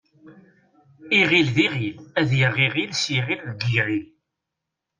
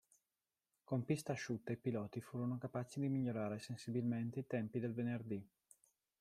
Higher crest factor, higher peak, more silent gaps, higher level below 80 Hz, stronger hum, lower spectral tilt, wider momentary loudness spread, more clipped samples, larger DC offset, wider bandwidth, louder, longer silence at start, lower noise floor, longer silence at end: about the same, 18 dB vs 18 dB; first, -6 dBFS vs -24 dBFS; neither; first, -58 dBFS vs -80 dBFS; neither; second, -5 dB/octave vs -7 dB/octave; first, 10 LU vs 5 LU; neither; neither; second, 9.6 kHz vs 14.5 kHz; first, -21 LUFS vs -43 LUFS; second, 0.25 s vs 0.9 s; second, -83 dBFS vs under -90 dBFS; first, 0.95 s vs 0.75 s